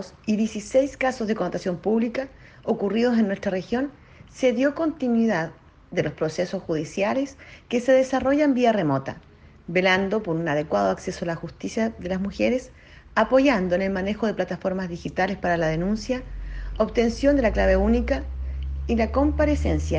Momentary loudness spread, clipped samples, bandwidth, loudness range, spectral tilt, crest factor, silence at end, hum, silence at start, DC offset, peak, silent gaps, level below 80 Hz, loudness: 10 LU; under 0.1%; 9.4 kHz; 3 LU; -6.5 dB/octave; 16 dB; 0 s; none; 0 s; under 0.1%; -6 dBFS; none; -36 dBFS; -24 LUFS